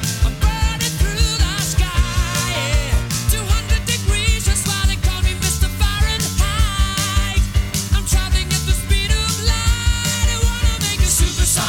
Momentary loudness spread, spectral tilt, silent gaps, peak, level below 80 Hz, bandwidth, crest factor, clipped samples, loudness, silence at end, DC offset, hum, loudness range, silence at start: 2 LU; -3 dB/octave; none; -2 dBFS; -20 dBFS; 17.5 kHz; 14 dB; under 0.1%; -18 LUFS; 0 s; under 0.1%; none; 1 LU; 0 s